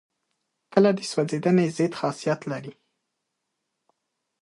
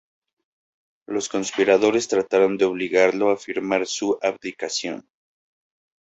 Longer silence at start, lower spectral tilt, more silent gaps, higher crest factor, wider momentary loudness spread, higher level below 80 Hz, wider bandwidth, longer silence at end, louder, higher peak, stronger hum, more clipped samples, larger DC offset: second, 0.7 s vs 1.1 s; first, -6.5 dB/octave vs -3.5 dB/octave; neither; about the same, 22 dB vs 20 dB; about the same, 12 LU vs 10 LU; second, -72 dBFS vs -66 dBFS; first, 11.5 kHz vs 8.2 kHz; first, 1.7 s vs 1.1 s; second, -24 LUFS vs -21 LUFS; about the same, -4 dBFS vs -4 dBFS; neither; neither; neither